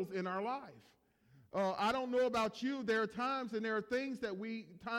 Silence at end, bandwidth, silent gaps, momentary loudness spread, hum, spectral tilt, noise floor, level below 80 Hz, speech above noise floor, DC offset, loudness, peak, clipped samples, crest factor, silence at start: 0 s; 16 kHz; none; 9 LU; none; -5 dB/octave; -67 dBFS; -74 dBFS; 30 dB; under 0.1%; -38 LUFS; -24 dBFS; under 0.1%; 14 dB; 0 s